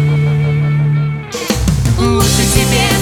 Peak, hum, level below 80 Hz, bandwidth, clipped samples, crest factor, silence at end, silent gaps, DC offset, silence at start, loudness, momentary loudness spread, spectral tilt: 0 dBFS; none; -24 dBFS; 17.5 kHz; under 0.1%; 12 dB; 0 s; none; under 0.1%; 0 s; -13 LUFS; 6 LU; -5 dB/octave